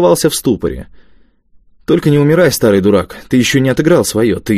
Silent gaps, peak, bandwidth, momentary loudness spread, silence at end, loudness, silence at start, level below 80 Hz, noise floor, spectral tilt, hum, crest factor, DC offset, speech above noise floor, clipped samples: none; 0 dBFS; 16 kHz; 7 LU; 0 s; -12 LUFS; 0 s; -38 dBFS; -47 dBFS; -5.5 dB/octave; none; 12 dB; under 0.1%; 36 dB; under 0.1%